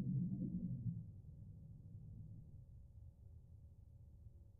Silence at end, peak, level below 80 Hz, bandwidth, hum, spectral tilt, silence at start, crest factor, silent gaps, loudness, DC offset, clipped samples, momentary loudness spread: 0 s; -32 dBFS; -62 dBFS; 1 kHz; none; -18 dB/octave; 0 s; 16 dB; none; -49 LUFS; under 0.1%; under 0.1%; 19 LU